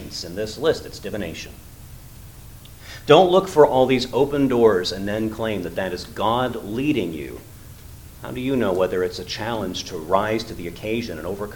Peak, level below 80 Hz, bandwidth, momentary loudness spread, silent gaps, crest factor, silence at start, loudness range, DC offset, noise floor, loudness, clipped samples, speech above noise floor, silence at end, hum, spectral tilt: 0 dBFS; -44 dBFS; 19 kHz; 26 LU; none; 22 dB; 0 s; 7 LU; under 0.1%; -41 dBFS; -21 LUFS; under 0.1%; 20 dB; 0 s; none; -5.5 dB/octave